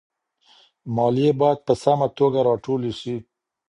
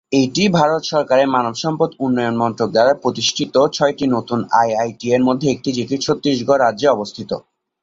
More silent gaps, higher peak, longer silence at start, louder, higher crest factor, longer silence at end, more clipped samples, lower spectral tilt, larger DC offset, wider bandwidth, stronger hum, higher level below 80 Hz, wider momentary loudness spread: neither; about the same, -4 dBFS vs -2 dBFS; first, 0.85 s vs 0.1 s; second, -21 LUFS vs -17 LUFS; about the same, 18 dB vs 16 dB; about the same, 0.45 s vs 0.4 s; neither; first, -7.5 dB/octave vs -5 dB/octave; neither; first, 11 kHz vs 7.8 kHz; neither; about the same, -58 dBFS vs -56 dBFS; first, 12 LU vs 6 LU